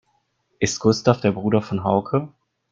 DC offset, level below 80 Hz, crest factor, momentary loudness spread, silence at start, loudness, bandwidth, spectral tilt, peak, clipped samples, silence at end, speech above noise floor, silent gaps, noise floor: under 0.1%; -56 dBFS; 20 dB; 7 LU; 0.6 s; -21 LUFS; 9 kHz; -5.5 dB/octave; -2 dBFS; under 0.1%; 0.45 s; 48 dB; none; -68 dBFS